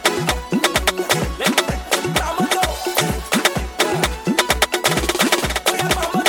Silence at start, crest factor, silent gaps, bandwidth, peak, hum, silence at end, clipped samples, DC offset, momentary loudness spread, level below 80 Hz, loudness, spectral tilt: 0 s; 18 dB; none; 19 kHz; 0 dBFS; none; 0 s; under 0.1%; under 0.1%; 4 LU; -32 dBFS; -18 LUFS; -3 dB/octave